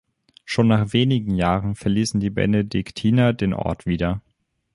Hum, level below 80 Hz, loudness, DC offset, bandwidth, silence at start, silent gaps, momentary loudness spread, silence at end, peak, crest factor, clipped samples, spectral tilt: none; -42 dBFS; -21 LUFS; under 0.1%; 11.5 kHz; 0.45 s; none; 7 LU; 0.55 s; -4 dBFS; 18 dB; under 0.1%; -6.5 dB/octave